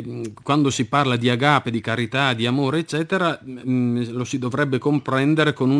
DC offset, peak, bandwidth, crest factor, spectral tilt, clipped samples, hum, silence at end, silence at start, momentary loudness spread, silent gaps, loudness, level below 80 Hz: under 0.1%; 0 dBFS; 10.5 kHz; 20 dB; -5.5 dB/octave; under 0.1%; none; 0 s; 0 s; 7 LU; none; -21 LUFS; -60 dBFS